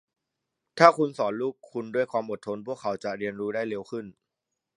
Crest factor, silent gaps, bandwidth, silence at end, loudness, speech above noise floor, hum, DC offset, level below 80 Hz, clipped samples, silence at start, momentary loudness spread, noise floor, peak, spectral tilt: 28 dB; none; 11 kHz; 0.65 s; -27 LUFS; 58 dB; none; under 0.1%; -74 dBFS; under 0.1%; 0.75 s; 18 LU; -85 dBFS; 0 dBFS; -5.5 dB/octave